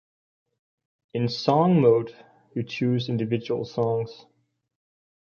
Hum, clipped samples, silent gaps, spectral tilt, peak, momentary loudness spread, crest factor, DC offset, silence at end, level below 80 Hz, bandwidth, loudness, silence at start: none; under 0.1%; none; -8 dB/octave; -4 dBFS; 16 LU; 22 dB; under 0.1%; 1.1 s; -66 dBFS; 7 kHz; -24 LUFS; 1.15 s